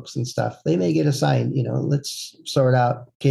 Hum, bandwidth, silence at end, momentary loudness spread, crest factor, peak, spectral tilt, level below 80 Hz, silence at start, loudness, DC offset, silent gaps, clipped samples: none; 12.5 kHz; 0 s; 7 LU; 16 dB; -6 dBFS; -6.5 dB/octave; -62 dBFS; 0 s; -22 LUFS; under 0.1%; 3.15-3.20 s; under 0.1%